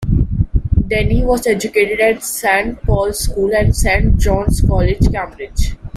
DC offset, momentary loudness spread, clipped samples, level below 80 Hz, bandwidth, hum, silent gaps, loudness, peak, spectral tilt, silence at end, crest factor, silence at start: under 0.1%; 5 LU; under 0.1%; -18 dBFS; 16 kHz; none; none; -16 LUFS; 0 dBFS; -5.5 dB/octave; 0 s; 14 dB; 0 s